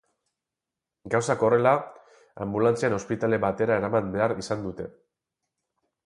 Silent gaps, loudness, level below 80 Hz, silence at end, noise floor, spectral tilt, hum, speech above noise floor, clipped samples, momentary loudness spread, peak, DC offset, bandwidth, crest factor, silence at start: none; -25 LUFS; -58 dBFS; 1.15 s; -88 dBFS; -6 dB/octave; none; 63 dB; under 0.1%; 14 LU; -6 dBFS; under 0.1%; 11.5 kHz; 20 dB; 1.05 s